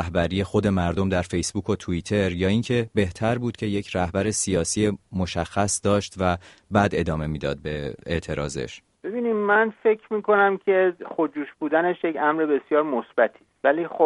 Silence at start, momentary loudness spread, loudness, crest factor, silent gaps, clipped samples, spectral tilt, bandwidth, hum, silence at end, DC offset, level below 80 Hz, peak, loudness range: 0 s; 8 LU; -24 LUFS; 20 dB; none; under 0.1%; -5 dB/octave; 11.5 kHz; none; 0 s; under 0.1%; -46 dBFS; -2 dBFS; 3 LU